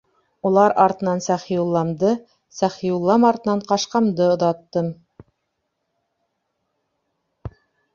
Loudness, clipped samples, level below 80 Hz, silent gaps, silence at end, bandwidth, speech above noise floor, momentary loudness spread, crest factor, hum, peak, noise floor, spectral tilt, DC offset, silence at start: -20 LUFS; under 0.1%; -56 dBFS; none; 0.45 s; 7.4 kHz; 57 dB; 13 LU; 20 dB; none; -2 dBFS; -75 dBFS; -6 dB/octave; under 0.1%; 0.45 s